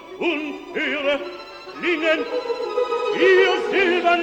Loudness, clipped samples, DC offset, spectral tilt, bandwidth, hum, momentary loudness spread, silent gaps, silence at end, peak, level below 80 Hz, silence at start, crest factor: -20 LUFS; under 0.1%; under 0.1%; -3.5 dB/octave; 8.8 kHz; none; 11 LU; none; 0 s; -4 dBFS; -60 dBFS; 0 s; 16 dB